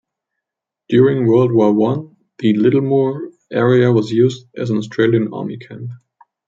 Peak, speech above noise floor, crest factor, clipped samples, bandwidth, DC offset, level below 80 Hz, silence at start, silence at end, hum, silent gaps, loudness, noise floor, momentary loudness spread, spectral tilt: -2 dBFS; 68 dB; 14 dB; under 0.1%; 7.6 kHz; under 0.1%; -60 dBFS; 0.9 s; 0.5 s; none; none; -15 LUFS; -83 dBFS; 15 LU; -8.5 dB/octave